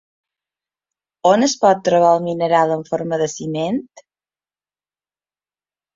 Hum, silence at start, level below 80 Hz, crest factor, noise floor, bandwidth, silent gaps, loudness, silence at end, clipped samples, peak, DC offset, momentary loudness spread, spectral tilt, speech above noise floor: 50 Hz at -50 dBFS; 1.25 s; -64 dBFS; 18 dB; under -90 dBFS; 7.8 kHz; none; -17 LUFS; 2.15 s; under 0.1%; -2 dBFS; under 0.1%; 8 LU; -5 dB/octave; over 74 dB